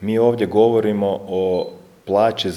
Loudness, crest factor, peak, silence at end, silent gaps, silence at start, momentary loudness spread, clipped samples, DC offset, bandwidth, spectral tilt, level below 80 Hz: -18 LUFS; 16 dB; -2 dBFS; 0 s; none; 0 s; 8 LU; under 0.1%; under 0.1%; 12.5 kHz; -6.5 dB/octave; -58 dBFS